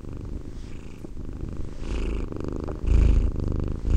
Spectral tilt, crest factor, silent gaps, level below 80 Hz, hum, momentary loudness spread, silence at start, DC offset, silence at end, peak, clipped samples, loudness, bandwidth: -8 dB/octave; 16 dB; none; -26 dBFS; none; 18 LU; 0 s; under 0.1%; 0 s; -8 dBFS; under 0.1%; -29 LUFS; 8.4 kHz